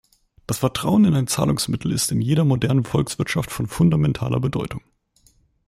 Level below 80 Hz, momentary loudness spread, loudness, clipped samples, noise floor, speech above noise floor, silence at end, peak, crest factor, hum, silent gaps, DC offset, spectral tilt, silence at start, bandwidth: -46 dBFS; 9 LU; -21 LUFS; under 0.1%; -59 dBFS; 39 dB; 0.9 s; -6 dBFS; 16 dB; none; none; under 0.1%; -5.5 dB/octave; 0.5 s; 16 kHz